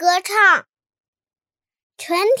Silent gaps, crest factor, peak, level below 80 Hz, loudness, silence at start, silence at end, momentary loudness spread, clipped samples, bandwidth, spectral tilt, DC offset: 1.00-1.13 s, 1.83-1.90 s; 18 dB; -2 dBFS; -86 dBFS; -16 LUFS; 0 s; 0 s; 11 LU; under 0.1%; 17 kHz; -0.5 dB/octave; under 0.1%